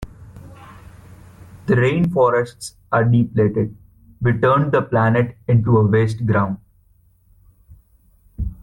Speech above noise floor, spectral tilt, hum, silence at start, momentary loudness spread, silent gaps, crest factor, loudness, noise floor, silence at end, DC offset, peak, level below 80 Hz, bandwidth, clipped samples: 39 dB; -8 dB/octave; none; 0 s; 14 LU; none; 14 dB; -18 LUFS; -56 dBFS; 0.1 s; under 0.1%; -4 dBFS; -42 dBFS; 11.5 kHz; under 0.1%